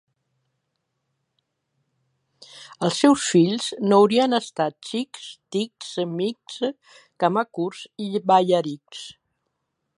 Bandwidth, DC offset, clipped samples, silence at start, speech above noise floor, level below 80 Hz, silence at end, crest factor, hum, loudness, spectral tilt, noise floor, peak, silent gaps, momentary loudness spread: 11.5 kHz; under 0.1%; under 0.1%; 2.55 s; 55 dB; -72 dBFS; 0.9 s; 20 dB; none; -22 LUFS; -5 dB/octave; -77 dBFS; -4 dBFS; none; 17 LU